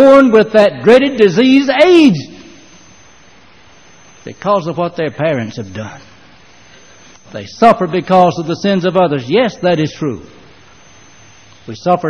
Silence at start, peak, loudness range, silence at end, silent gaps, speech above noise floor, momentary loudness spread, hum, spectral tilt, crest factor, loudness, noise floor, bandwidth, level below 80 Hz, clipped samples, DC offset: 0 s; 0 dBFS; 9 LU; 0 s; none; 33 dB; 20 LU; none; -6.5 dB/octave; 12 dB; -11 LUFS; -44 dBFS; 10.5 kHz; -50 dBFS; 0.2%; 0.5%